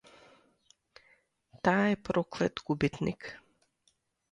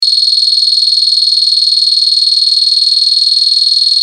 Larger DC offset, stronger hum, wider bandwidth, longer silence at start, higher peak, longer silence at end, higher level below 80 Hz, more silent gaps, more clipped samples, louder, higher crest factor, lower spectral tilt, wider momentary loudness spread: neither; neither; second, 10.5 kHz vs 13.5 kHz; first, 1.65 s vs 0 s; second, -12 dBFS vs 0 dBFS; first, 0.95 s vs 0 s; first, -60 dBFS vs -88 dBFS; neither; neither; second, -31 LUFS vs -6 LUFS; first, 22 dB vs 10 dB; first, -6.5 dB/octave vs 8.5 dB/octave; first, 16 LU vs 0 LU